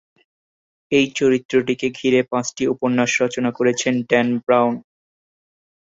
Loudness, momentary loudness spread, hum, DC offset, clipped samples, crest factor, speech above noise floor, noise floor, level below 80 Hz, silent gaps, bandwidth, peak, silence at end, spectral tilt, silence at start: -19 LUFS; 5 LU; none; under 0.1%; under 0.1%; 18 dB; over 72 dB; under -90 dBFS; -62 dBFS; 1.45-1.49 s; 8 kHz; -2 dBFS; 1.05 s; -4.5 dB/octave; 0.9 s